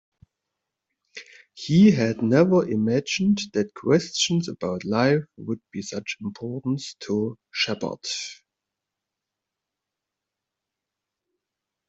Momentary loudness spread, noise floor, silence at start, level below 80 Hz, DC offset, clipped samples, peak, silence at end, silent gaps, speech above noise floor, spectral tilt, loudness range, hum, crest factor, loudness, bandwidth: 15 LU; -86 dBFS; 1.15 s; -62 dBFS; under 0.1%; under 0.1%; -4 dBFS; 3.55 s; none; 63 dB; -5.5 dB/octave; 11 LU; none; 22 dB; -23 LUFS; 8 kHz